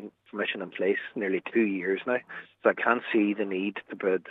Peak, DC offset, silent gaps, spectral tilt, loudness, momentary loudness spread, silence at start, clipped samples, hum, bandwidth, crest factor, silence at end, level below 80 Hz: -6 dBFS; under 0.1%; none; -8 dB/octave; -28 LUFS; 7 LU; 0 s; under 0.1%; none; 4 kHz; 22 dB; 0 s; -84 dBFS